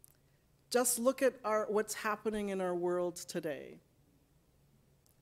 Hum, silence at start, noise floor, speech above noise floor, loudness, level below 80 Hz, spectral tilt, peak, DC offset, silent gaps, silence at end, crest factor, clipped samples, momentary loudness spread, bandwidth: none; 0.7 s; -70 dBFS; 35 dB; -34 LUFS; -70 dBFS; -3.5 dB/octave; -18 dBFS; under 0.1%; none; 1.45 s; 18 dB; under 0.1%; 10 LU; 16 kHz